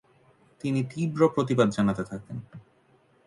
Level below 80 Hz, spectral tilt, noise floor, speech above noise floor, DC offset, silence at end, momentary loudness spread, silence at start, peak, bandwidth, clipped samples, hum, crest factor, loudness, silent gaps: -60 dBFS; -7.5 dB/octave; -63 dBFS; 37 dB; under 0.1%; 0.65 s; 15 LU; 0.65 s; -8 dBFS; 11.5 kHz; under 0.1%; none; 20 dB; -26 LUFS; none